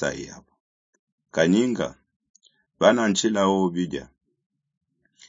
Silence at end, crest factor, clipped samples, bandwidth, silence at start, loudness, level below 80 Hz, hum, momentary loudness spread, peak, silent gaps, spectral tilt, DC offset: 1.25 s; 24 dB; under 0.1%; 7.8 kHz; 0 s; -22 LUFS; -60 dBFS; none; 14 LU; -2 dBFS; 0.60-0.93 s, 0.99-1.18 s, 2.16-2.20 s, 2.30-2.34 s; -4.5 dB/octave; under 0.1%